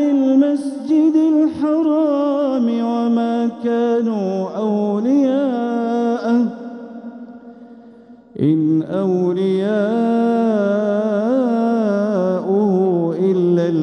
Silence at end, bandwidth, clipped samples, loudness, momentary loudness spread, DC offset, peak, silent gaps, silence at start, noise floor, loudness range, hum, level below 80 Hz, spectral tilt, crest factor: 0 s; 10 kHz; under 0.1%; -17 LUFS; 6 LU; under 0.1%; -4 dBFS; none; 0 s; -42 dBFS; 4 LU; none; -66 dBFS; -8.5 dB/octave; 12 dB